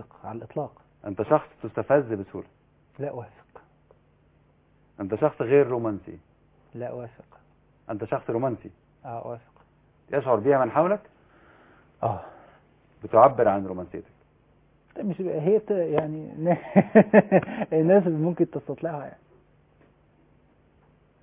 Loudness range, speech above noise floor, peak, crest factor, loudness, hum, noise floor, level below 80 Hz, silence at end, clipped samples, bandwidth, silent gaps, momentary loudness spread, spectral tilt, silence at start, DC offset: 12 LU; 38 dB; -4 dBFS; 24 dB; -24 LUFS; none; -61 dBFS; -62 dBFS; 2.1 s; under 0.1%; 3.7 kHz; none; 21 LU; -12 dB/octave; 0 s; under 0.1%